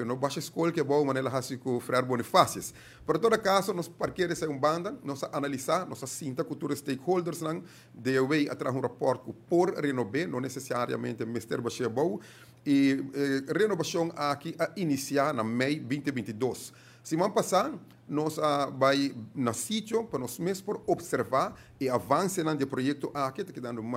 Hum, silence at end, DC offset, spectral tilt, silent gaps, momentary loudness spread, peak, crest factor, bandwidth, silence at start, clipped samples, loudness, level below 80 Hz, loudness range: none; 0 s; under 0.1%; -5 dB/octave; none; 9 LU; -6 dBFS; 24 dB; 16 kHz; 0 s; under 0.1%; -30 LUFS; -68 dBFS; 3 LU